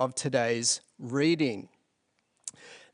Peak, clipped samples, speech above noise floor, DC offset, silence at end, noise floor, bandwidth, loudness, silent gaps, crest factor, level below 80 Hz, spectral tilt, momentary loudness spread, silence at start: -12 dBFS; under 0.1%; 47 dB; under 0.1%; 0.15 s; -76 dBFS; 10.5 kHz; -28 LUFS; none; 18 dB; -76 dBFS; -3.5 dB/octave; 17 LU; 0 s